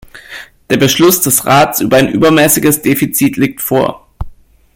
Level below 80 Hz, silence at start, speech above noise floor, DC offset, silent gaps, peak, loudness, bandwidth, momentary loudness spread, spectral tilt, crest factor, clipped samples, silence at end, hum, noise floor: -36 dBFS; 0.15 s; 23 dB; under 0.1%; none; 0 dBFS; -10 LUFS; 17.5 kHz; 21 LU; -4 dB/octave; 12 dB; under 0.1%; 0.4 s; none; -33 dBFS